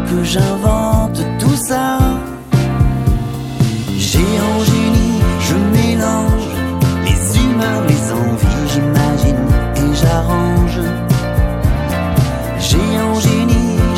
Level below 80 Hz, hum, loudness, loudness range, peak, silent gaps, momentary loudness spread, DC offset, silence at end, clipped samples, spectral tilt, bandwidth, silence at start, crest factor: -20 dBFS; none; -14 LUFS; 1 LU; 0 dBFS; none; 4 LU; under 0.1%; 0 s; under 0.1%; -6 dB/octave; 17 kHz; 0 s; 14 dB